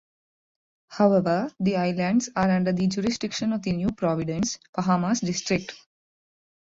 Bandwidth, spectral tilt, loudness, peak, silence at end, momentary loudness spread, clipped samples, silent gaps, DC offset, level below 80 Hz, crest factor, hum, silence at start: 7.8 kHz; -5.5 dB/octave; -25 LUFS; -6 dBFS; 1 s; 6 LU; under 0.1%; 4.69-4.73 s; under 0.1%; -56 dBFS; 18 dB; none; 0.9 s